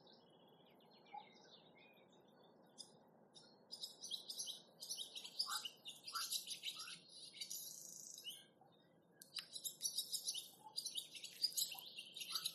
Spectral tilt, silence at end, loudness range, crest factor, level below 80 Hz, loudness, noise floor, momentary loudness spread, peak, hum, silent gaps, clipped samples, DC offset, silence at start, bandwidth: 1.5 dB/octave; 0 s; 14 LU; 24 dB; under -90 dBFS; -46 LUFS; -72 dBFS; 22 LU; -26 dBFS; none; none; under 0.1%; under 0.1%; 0 s; 13 kHz